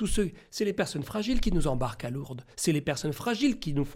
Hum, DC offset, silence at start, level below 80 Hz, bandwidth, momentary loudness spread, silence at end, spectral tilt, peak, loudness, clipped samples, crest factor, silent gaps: none; under 0.1%; 0 s; -36 dBFS; 16.5 kHz; 7 LU; 0 s; -5 dB/octave; -14 dBFS; -30 LUFS; under 0.1%; 14 dB; none